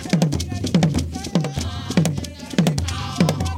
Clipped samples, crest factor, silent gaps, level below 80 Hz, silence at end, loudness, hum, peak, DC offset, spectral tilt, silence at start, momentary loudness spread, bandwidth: under 0.1%; 18 dB; none; -36 dBFS; 0 s; -22 LUFS; none; -2 dBFS; under 0.1%; -5.5 dB/octave; 0 s; 6 LU; 16.5 kHz